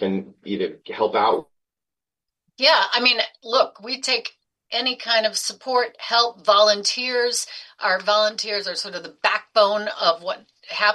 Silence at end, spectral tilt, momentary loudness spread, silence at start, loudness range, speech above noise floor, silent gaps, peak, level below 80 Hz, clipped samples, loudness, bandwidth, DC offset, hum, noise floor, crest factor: 0 s; -1.5 dB/octave; 12 LU; 0 s; 2 LU; 68 dB; none; -2 dBFS; -76 dBFS; under 0.1%; -20 LUFS; 12.5 kHz; under 0.1%; none; -89 dBFS; 20 dB